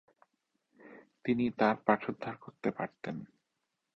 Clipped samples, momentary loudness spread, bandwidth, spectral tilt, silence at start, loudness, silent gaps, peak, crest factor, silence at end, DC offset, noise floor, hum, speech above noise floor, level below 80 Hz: under 0.1%; 14 LU; 6.2 kHz; -8 dB/octave; 0.85 s; -34 LUFS; none; -10 dBFS; 26 dB; 0.75 s; under 0.1%; -84 dBFS; none; 51 dB; -72 dBFS